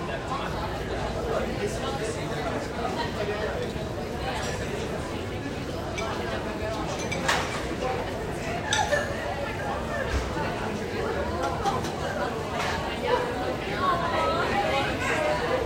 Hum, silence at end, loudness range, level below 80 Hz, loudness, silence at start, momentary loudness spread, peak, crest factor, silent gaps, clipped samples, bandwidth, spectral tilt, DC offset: none; 0 s; 4 LU; -40 dBFS; -28 LUFS; 0 s; 6 LU; -10 dBFS; 20 dB; none; under 0.1%; 16 kHz; -4.5 dB/octave; under 0.1%